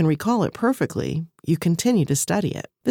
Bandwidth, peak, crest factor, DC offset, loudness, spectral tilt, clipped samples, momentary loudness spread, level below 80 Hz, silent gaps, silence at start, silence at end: 18 kHz; -6 dBFS; 14 dB; under 0.1%; -22 LUFS; -5.5 dB/octave; under 0.1%; 8 LU; -56 dBFS; none; 0 s; 0 s